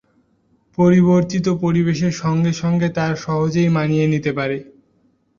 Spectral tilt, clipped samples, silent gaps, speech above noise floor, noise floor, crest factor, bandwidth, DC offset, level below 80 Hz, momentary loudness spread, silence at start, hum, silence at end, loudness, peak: -7.5 dB/octave; under 0.1%; none; 44 dB; -60 dBFS; 14 dB; 7.4 kHz; under 0.1%; -50 dBFS; 8 LU; 0.8 s; none; 0.75 s; -18 LUFS; -4 dBFS